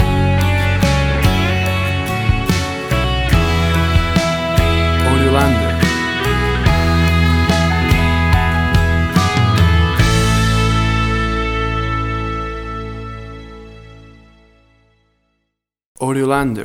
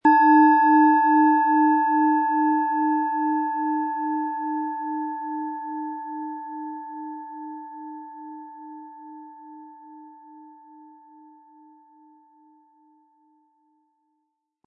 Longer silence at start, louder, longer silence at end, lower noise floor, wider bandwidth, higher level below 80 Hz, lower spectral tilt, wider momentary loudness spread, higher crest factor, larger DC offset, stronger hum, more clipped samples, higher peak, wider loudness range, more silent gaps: about the same, 0 s vs 0.05 s; first, -15 LUFS vs -21 LUFS; second, 0 s vs 4.2 s; about the same, -74 dBFS vs -77 dBFS; first, 17.5 kHz vs 5.2 kHz; first, -22 dBFS vs -82 dBFS; second, -5.5 dB/octave vs -7.5 dB/octave; second, 8 LU vs 25 LU; about the same, 14 dB vs 18 dB; neither; neither; neither; first, 0 dBFS vs -6 dBFS; second, 11 LU vs 24 LU; first, 15.86-15.95 s vs none